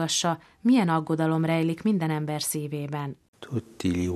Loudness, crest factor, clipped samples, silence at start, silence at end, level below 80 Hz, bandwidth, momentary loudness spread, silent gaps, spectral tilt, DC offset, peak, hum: -26 LUFS; 14 dB; under 0.1%; 0 s; 0 s; -58 dBFS; 13.5 kHz; 12 LU; 3.28-3.33 s; -5 dB/octave; under 0.1%; -12 dBFS; none